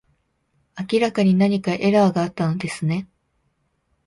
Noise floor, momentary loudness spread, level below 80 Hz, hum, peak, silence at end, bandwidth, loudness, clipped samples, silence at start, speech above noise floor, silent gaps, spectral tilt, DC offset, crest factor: -69 dBFS; 10 LU; -60 dBFS; none; -4 dBFS; 1 s; 11.5 kHz; -20 LUFS; under 0.1%; 0.75 s; 50 dB; none; -7 dB/octave; under 0.1%; 16 dB